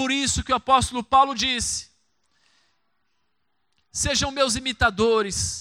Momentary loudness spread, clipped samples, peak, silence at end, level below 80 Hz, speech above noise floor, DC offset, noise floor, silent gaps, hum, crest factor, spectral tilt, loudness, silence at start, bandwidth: 7 LU; under 0.1%; -6 dBFS; 0 s; -42 dBFS; 54 dB; under 0.1%; -76 dBFS; none; none; 18 dB; -2.5 dB/octave; -22 LUFS; 0 s; 16.5 kHz